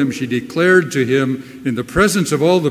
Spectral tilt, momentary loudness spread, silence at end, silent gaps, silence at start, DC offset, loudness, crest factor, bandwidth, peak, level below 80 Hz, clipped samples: -5 dB/octave; 9 LU; 0 s; none; 0 s; under 0.1%; -16 LUFS; 16 dB; 16 kHz; 0 dBFS; -40 dBFS; under 0.1%